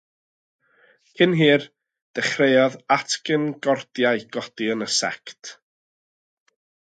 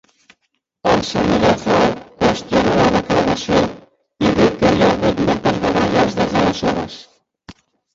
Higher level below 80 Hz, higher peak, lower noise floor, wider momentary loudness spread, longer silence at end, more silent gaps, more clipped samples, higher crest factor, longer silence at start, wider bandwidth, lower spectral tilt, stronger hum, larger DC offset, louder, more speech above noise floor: second, -72 dBFS vs -38 dBFS; about the same, -4 dBFS vs -2 dBFS; second, -59 dBFS vs -70 dBFS; first, 17 LU vs 6 LU; first, 1.35 s vs 0.45 s; first, 2.02-2.14 s vs none; neither; about the same, 20 dB vs 16 dB; first, 1.2 s vs 0.85 s; first, 9.4 kHz vs 7.8 kHz; second, -4 dB/octave vs -5.5 dB/octave; neither; neither; second, -21 LUFS vs -16 LUFS; second, 38 dB vs 54 dB